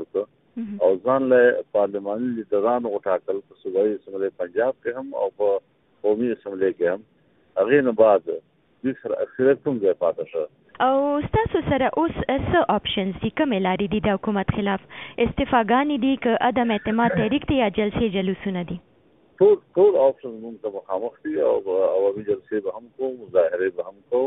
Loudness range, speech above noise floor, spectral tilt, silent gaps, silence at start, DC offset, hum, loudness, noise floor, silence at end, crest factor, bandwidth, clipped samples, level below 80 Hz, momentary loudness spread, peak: 4 LU; 36 dB; -11 dB/octave; none; 0 s; under 0.1%; none; -22 LUFS; -58 dBFS; 0 s; 18 dB; 3.9 kHz; under 0.1%; -48 dBFS; 12 LU; -4 dBFS